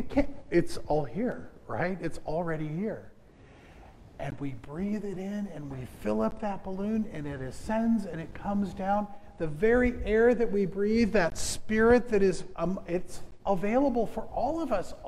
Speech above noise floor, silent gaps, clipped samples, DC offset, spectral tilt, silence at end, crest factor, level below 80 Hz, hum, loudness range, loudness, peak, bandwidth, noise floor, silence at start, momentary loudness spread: 25 dB; none; under 0.1%; under 0.1%; -6 dB/octave; 0 s; 20 dB; -44 dBFS; none; 10 LU; -30 LUFS; -10 dBFS; 13.5 kHz; -54 dBFS; 0 s; 13 LU